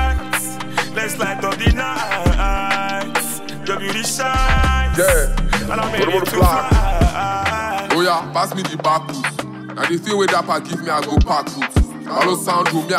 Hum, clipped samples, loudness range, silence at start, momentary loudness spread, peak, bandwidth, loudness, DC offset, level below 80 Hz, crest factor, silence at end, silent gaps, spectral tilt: none; under 0.1%; 3 LU; 0 s; 6 LU; -2 dBFS; 16 kHz; -18 LUFS; under 0.1%; -24 dBFS; 16 dB; 0 s; none; -4.5 dB/octave